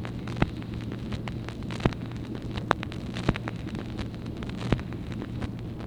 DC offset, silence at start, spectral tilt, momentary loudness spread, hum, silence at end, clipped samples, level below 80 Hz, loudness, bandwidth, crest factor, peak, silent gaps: under 0.1%; 0 s; -7 dB/octave; 6 LU; none; 0 s; under 0.1%; -40 dBFS; -33 LUFS; 11.5 kHz; 30 dB; -2 dBFS; none